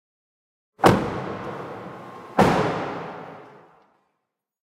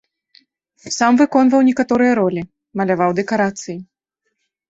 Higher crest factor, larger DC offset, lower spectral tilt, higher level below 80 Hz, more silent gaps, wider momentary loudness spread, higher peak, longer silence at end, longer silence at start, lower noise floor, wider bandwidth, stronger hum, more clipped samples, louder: first, 24 dB vs 16 dB; neither; about the same, -6 dB/octave vs -5.5 dB/octave; first, -50 dBFS vs -58 dBFS; neither; first, 20 LU vs 16 LU; about the same, -2 dBFS vs -2 dBFS; first, 1.15 s vs 0.85 s; about the same, 0.8 s vs 0.85 s; first, -79 dBFS vs -74 dBFS; first, 16.5 kHz vs 8 kHz; neither; neither; second, -23 LUFS vs -16 LUFS